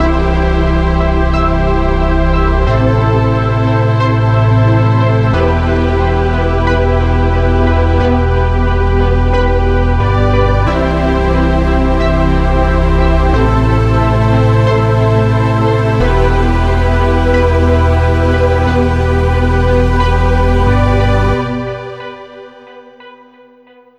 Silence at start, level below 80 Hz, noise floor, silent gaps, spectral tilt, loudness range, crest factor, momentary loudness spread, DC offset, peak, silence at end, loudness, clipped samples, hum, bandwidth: 0 s; -16 dBFS; -43 dBFS; none; -8 dB/octave; 1 LU; 10 dB; 2 LU; under 0.1%; 0 dBFS; 0.85 s; -12 LUFS; under 0.1%; none; 8.6 kHz